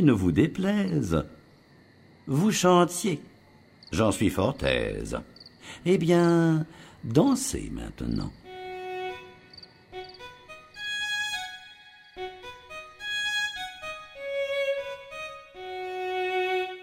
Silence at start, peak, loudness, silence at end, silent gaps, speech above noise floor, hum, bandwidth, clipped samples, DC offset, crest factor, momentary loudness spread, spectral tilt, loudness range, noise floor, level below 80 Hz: 0 s; -6 dBFS; -27 LUFS; 0 s; none; 31 dB; none; 16 kHz; under 0.1%; under 0.1%; 22 dB; 22 LU; -5 dB/octave; 9 LU; -56 dBFS; -48 dBFS